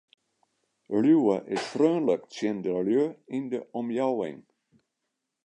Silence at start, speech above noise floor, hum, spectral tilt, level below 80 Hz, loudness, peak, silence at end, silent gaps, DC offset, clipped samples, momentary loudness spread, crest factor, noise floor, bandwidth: 0.9 s; 57 dB; none; -6.5 dB/octave; -76 dBFS; -27 LUFS; -10 dBFS; 1.05 s; none; under 0.1%; under 0.1%; 10 LU; 18 dB; -83 dBFS; 10 kHz